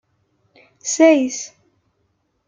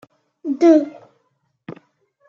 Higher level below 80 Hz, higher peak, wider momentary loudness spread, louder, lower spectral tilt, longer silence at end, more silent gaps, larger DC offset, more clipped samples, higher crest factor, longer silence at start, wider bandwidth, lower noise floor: first, -70 dBFS vs -78 dBFS; about the same, -2 dBFS vs -2 dBFS; second, 17 LU vs 26 LU; about the same, -17 LUFS vs -16 LUFS; second, -1.5 dB/octave vs -6.5 dB/octave; first, 1 s vs 0.55 s; neither; neither; neither; about the same, 20 dB vs 18 dB; first, 0.85 s vs 0.45 s; first, 9.6 kHz vs 7 kHz; about the same, -68 dBFS vs -68 dBFS